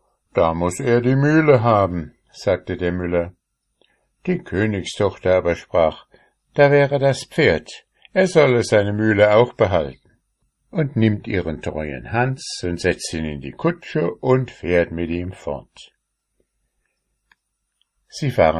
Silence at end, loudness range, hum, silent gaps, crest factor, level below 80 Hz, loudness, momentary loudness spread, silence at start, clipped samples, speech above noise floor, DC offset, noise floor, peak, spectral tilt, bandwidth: 0 s; 7 LU; none; none; 20 dB; -42 dBFS; -19 LUFS; 14 LU; 0.35 s; under 0.1%; 53 dB; under 0.1%; -72 dBFS; 0 dBFS; -6.5 dB/octave; 12.5 kHz